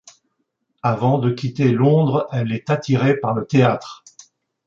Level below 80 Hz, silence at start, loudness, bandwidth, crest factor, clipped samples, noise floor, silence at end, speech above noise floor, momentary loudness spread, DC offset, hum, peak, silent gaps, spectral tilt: -58 dBFS; 0.85 s; -19 LUFS; 7.4 kHz; 16 dB; under 0.1%; -72 dBFS; 0.7 s; 54 dB; 8 LU; under 0.1%; none; -2 dBFS; none; -8 dB/octave